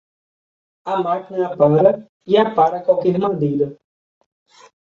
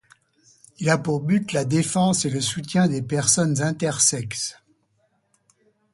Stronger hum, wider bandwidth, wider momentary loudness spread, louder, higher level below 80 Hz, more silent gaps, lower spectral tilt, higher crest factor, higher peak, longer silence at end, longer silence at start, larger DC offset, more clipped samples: neither; second, 7.2 kHz vs 11.5 kHz; about the same, 10 LU vs 8 LU; first, -18 LUFS vs -22 LUFS; about the same, -62 dBFS vs -58 dBFS; first, 2.09-2.20 s vs none; first, -8.5 dB/octave vs -4 dB/octave; about the same, 18 dB vs 20 dB; about the same, -2 dBFS vs -4 dBFS; second, 1.25 s vs 1.4 s; about the same, 0.85 s vs 0.8 s; neither; neither